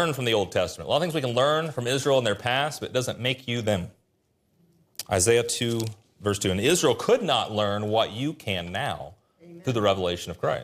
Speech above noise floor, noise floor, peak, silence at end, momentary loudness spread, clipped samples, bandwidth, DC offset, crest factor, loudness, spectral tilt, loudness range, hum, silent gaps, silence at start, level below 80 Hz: 45 dB; -70 dBFS; -8 dBFS; 0 s; 9 LU; under 0.1%; 15.5 kHz; under 0.1%; 18 dB; -25 LUFS; -4 dB/octave; 3 LU; none; none; 0 s; -60 dBFS